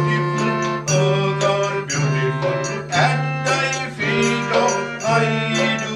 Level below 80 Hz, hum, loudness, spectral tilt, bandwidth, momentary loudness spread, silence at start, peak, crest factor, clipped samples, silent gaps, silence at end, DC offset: -54 dBFS; none; -19 LUFS; -4.5 dB/octave; 11 kHz; 4 LU; 0 s; -4 dBFS; 16 dB; under 0.1%; none; 0 s; under 0.1%